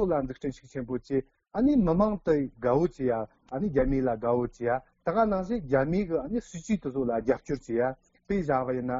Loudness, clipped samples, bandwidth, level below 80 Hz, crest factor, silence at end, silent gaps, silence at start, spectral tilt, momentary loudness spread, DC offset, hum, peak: -28 LUFS; under 0.1%; 7.6 kHz; -46 dBFS; 16 dB; 0 s; none; 0 s; -8 dB/octave; 9 LU; under 0.1%; none; -12 dBFS